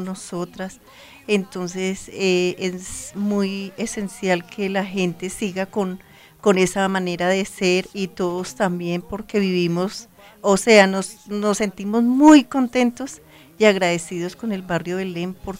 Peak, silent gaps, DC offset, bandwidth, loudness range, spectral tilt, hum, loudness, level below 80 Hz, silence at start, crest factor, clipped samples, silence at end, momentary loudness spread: 0 dBFS; none; under 0.1%; 16 kHz; 7 LU; -5 dB/octave; none; -21 LUFS; -54 dBFS; 0 s; 20 dB; under 0.1%; 0 s; 15 LU